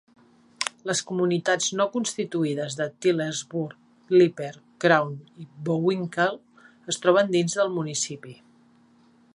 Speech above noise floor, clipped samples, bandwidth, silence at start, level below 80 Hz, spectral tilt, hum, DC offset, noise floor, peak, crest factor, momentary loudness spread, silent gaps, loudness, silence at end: 34 dB; under 0.1%; 11.5 kHz; 0.6 s; -74 dBFS; -4 dB/octave; none; under 0.1%; -58 dBFS; -4 dBFS; 22 dB; 15 LU; none; -25 LUFS; 1 s